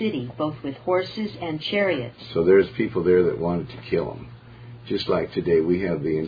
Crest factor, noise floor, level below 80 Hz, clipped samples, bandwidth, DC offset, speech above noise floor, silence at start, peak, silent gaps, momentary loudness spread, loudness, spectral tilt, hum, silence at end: 18 dB; -42 dBFS; -52 dBFS; under 0.1%; 5 kHz; under 0.1%; 20 dB; 0 s; -6 dBFS; none; 12 LU; -23 LUFS; -8.5 dB/octave; none; 0 s